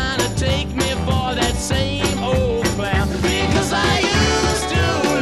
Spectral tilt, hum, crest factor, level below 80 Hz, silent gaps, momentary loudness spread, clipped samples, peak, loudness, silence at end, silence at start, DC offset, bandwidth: -4.5 dB/octave; none; 14 dB; -28 dBFS; none; 4 LU; under 0.1%; -4 dBFS; -18 LUFS; 0 s; 0 s; 0.5%; 15 kHz